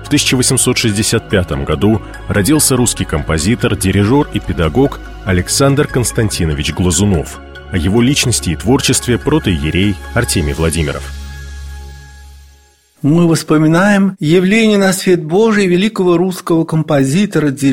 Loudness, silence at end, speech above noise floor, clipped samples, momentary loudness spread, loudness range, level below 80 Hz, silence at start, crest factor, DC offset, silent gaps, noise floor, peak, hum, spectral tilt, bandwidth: -13 LUFS; 0 s; 36 dB; under 0.1%; 8 LU; 5 LU; -28 dBFS; 0 s; 12 dB; under 0.1%; none; -48 dBFS; 0 dBFS; none; -4.5 dB/octave; 16.5 kHz